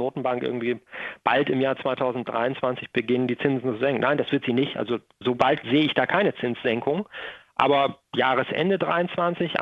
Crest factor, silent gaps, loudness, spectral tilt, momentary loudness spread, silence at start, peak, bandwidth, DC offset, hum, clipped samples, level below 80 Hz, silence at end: 22 dB; none; -24 LUFS; -7.5 dB/octave; 7 LU; 0 s; -2 dBFS; 7.4 kHz; under 0.1%; none; under 0.1%; -64 dBFS; 0 s